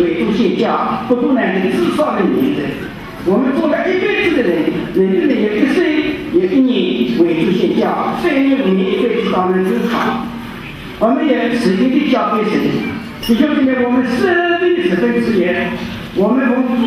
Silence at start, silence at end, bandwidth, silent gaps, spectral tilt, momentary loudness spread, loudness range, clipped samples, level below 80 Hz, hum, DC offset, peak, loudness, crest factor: 0 s; 0 s; 14.5 kHz; none; -6.5 dB/octave; 6 LU; 1 LU; under 0.1%; -44 dBFS; none; under 0.1%; -2 dBFS; -14 LUFS; 12 dB